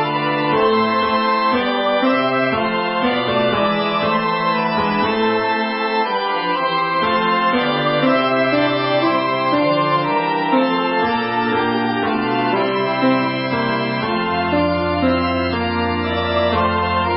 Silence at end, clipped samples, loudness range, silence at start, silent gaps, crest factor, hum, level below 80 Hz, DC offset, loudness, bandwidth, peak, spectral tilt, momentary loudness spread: 0 s; under 0.1%; 2 LU; 0 s; none; 14 dB; none; -40 dBFS; under 0.1%; -17 LUFS; 5.6 kHz; -4 dBFS; -10.5 dB/octave; 3 LU